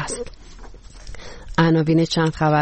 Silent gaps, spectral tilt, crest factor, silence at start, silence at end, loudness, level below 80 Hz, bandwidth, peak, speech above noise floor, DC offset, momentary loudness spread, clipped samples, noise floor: none; -6 dB/octave; 16 dB; 0 s; 0 s; -19 LUFS; -40 dBFS; 8.8 kHz; -6 dBFS; 20 dB; under 0.1%; 22 LU; under 0.1%; -38 dBFS